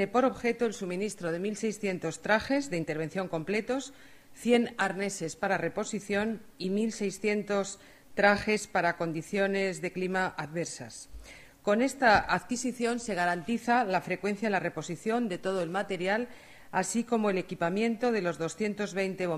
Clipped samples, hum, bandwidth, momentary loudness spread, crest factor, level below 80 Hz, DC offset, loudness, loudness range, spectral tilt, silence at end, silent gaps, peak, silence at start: under 0.1%; none; 14.5 kHz; 9 LU; 22 dB; -60 dBFS; under 0.1%; -30 LUFS; 3 LU; -4.5 dB/octave; 0 s; none; -8 dBFS; 0 s